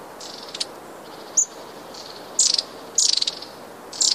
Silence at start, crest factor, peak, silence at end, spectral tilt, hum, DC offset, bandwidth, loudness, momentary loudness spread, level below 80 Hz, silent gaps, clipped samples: 0 s; 20 dB; -6 dBFS; 0 s; 1.5 dB/octave; none; under 0.1%; 15.5 kHz; -21 LUFS; 21 LU; -68 dBFS; none; under 0.1%